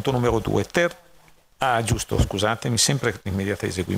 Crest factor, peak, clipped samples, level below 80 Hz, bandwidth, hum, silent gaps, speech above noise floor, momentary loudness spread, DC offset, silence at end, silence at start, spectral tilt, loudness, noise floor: 18 dB; -4 dBFS; under 0.1%; -38 dBFS; 16 kHz; none; none; 31 dB; 6 LU; under 0.1%; 0 s; 0 s; -4 dB/octave; -23 LUFS; -53 dBFS